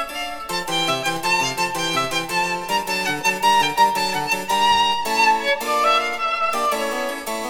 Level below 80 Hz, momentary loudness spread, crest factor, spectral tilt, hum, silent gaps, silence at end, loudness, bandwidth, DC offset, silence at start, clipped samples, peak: -52 dBFS; 6 LU; 16 dB; -2 dB/octave; none; none; 0 s; -19 LUFS; over 20 kHz; under 0.1%; 0 s; under 0.1%; -4 dBFS